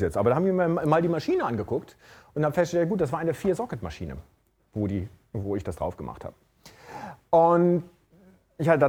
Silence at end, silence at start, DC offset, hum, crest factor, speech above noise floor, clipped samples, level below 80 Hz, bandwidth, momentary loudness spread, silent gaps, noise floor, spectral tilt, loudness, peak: 0 s; 0 s; under 0.1%; none; 20 dB; 32 dB; under 0.1%; -54 dBFS; 16.5 kHz; 17 LU; none; -57 dBFS; -8 dB/octave; -26 LUFS; -6 dBFS